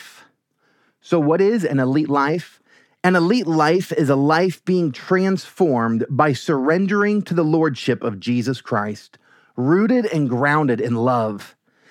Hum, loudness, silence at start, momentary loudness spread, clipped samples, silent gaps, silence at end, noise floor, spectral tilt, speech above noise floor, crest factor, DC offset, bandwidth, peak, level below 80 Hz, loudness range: none; -19 LUFS; 0 s; 6 LU; under 0.1%; none; 0.45 s; -64 dBFS; -7 dB/octave; 46 dB; 18 dB; under 0.1%; 16 kHz; -2 dBFS; -74 dBFS; 2 LU